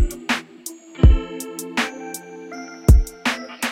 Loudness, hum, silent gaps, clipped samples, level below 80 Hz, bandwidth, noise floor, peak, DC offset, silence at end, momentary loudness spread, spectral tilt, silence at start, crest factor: -21 LUFS; none; none; under 0.1%; -22 dBFS; 16.5 kHz; -39 dBFS; 0 dBFS; under 0.1%; 0 s; 18 LU; -5 dB/octave; 0 s; 20 dB